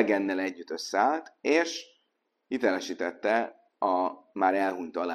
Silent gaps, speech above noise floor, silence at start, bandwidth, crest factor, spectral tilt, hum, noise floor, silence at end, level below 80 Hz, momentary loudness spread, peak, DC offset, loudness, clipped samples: none; 49 dB; 0 s; 13 kHz; 22 dB; -3.5 dB/octave; none; -77 dBFS; 0 s; -76 dBFS; 8 LU; -8 dBFS; under 0.1%; -29 LUFS; under 0.1%